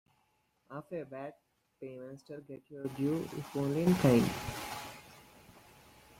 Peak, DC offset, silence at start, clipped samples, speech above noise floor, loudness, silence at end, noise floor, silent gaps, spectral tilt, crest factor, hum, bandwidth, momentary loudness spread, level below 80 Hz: -14 dBFS; under 0.1%; 0.7 s; under 0.1%; 42 dB; -33 LUFS; 0.6 s; -75 dBFS; none; -6.5 dB/octave; 22 dB; none; 16.5 kHz; 21 LU; -62 dBFS